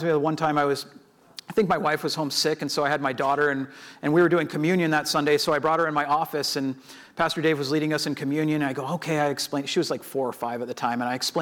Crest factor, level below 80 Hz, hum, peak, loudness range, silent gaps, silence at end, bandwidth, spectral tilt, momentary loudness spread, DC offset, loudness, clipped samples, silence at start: 16 dB; -64 dBFS; none; -10 dBFS; 3 LU; none; 0 s; 19 kHz; -4.5 dB/octave; 9 LU; under 0.1%; -24 LUFS; under 0.1%; 0 s